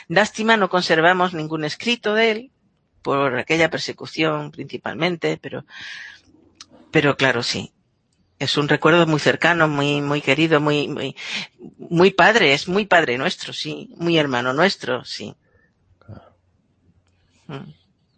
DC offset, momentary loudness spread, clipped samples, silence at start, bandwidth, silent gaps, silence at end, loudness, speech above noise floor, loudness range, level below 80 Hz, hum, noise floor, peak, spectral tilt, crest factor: under 0.1%; 16 LU; under 0.1%; 0.1 s; 8.8 kHz; none; 0.45 s; -19 LUFS; 45 dB; 6 LU; -62 dBFS; none; -65 dBFS; 0 dBFS; -5 dB/octave; 20 dB